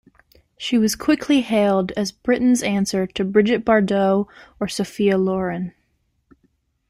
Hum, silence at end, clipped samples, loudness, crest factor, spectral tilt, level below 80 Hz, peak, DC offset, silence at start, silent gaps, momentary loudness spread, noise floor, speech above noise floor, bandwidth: none; 1.2 s; under 0.1%; -20 LUFS; 18 dB; -5 dB/octave; -52 dBFS; -4 dBFS; under 0.1%; 0.6 s; none; 9 LU; -67 dBFS; 48 dB; 15.5 kHz